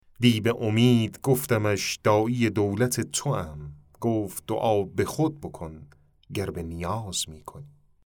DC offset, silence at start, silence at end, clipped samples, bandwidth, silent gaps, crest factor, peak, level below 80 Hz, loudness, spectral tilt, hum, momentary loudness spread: under 0.1%; 0.2 s; 0.35 s; under 0.1%; over 20 kHz; none; 20 dB; -6 dBFS; -56 dBFS; -26 LUFS; -5.5 dB/octave; none; 16 LU